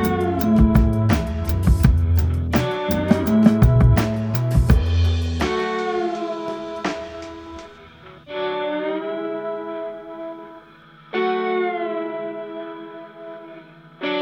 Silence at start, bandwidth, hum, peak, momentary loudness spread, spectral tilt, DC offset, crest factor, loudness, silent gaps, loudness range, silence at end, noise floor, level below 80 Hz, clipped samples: 0 s; over 20 kHz; 50 Hz at -45 dBFS; 0 dBFS; 20 LU; -7.5 dB/octave; under 0.1%; 20 dB; -20 LUFS; none; 10 LU; 0 s; -47 dBFS; -26 dBFS; under 0.1%